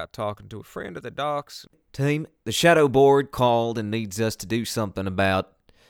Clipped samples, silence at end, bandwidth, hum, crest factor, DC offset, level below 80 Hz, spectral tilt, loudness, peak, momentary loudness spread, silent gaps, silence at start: under 0.1%; 0.45 s; 19 kHz; none; 18 dB; under 0.1%; -54 dBFS; -5 dB/octave; -23 LUFS; -6 dBFS; 20 LU; none; 0 s